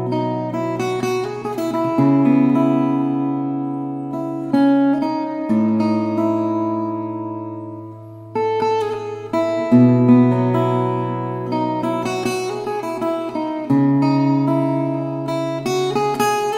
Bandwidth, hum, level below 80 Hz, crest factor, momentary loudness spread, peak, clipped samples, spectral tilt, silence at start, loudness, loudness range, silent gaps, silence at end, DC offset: 15.5 kHz; none; -60 dBFS; 16 dB; 11 LU; -2 dBFS; under 0.1%; -7.5 dB/octave; 0 s; -19 LUFS; 5 LU; none; 0 s; under 0.1%